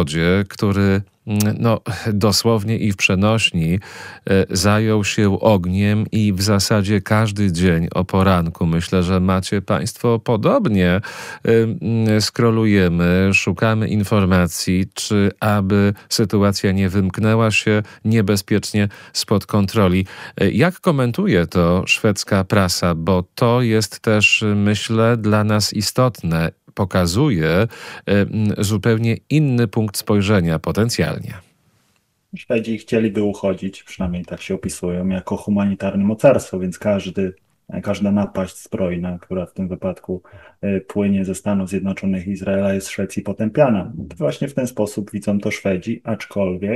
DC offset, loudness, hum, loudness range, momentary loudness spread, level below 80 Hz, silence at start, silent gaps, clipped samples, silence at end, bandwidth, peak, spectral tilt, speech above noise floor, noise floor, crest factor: under 0.1%; -18 LUFS; none; 6 LU; 9 LU; -44 dBFS; 0 s; none; under 0.1%; 0 s; 16 kHz; 0 dBFS; -5.5 dB/octave; 46 dB; -64 dBFS; 18 dB